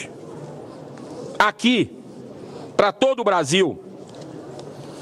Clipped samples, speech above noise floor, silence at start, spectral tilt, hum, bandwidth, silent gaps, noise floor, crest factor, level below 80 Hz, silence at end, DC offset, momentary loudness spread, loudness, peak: under 0.1%; 20 dB; 0 s; -4 dB/octave; none; 14 kHz; none; -38 dBFS; 22 dB; -64 dBFS; 0 s; under 0.1%; 20 LU; -20 LUFS; -2 dBFS